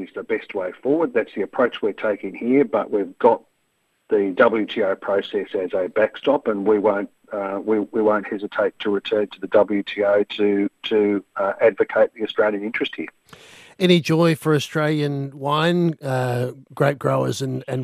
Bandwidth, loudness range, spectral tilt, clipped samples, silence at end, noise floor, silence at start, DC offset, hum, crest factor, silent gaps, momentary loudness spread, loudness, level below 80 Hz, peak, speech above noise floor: 14.5 kHz; 2 LU; -6.5 dB/octave; under 0.1%; 0 s; -68 dBFS; 0 s; under 0.1%; none; 20 dB; none; 8 LU; -21 LUFS; -68 dBFS; -2 dBFS; 48 dB